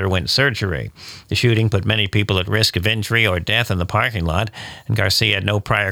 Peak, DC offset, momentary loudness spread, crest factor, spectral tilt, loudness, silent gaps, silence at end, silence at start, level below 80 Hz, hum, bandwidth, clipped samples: -2 dBFS; under 0.1%; 8 LU; 16 dB; -4.5 dB/octave; -18 LUFS; none; 0 s; 0 s; -40 dBFS; none; 18 kHz; under 0.1%